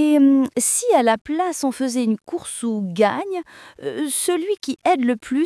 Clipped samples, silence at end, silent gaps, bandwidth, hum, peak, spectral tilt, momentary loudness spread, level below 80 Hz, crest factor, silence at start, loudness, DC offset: under 0.1%; 0 s; 1.21-1.25 s; 12 kHz; none; -4 dBFS; -3.5 dB/octave; 12 LU; -64 dBFS; 16 dB; 0 s; -20 LUFS; under 0.1%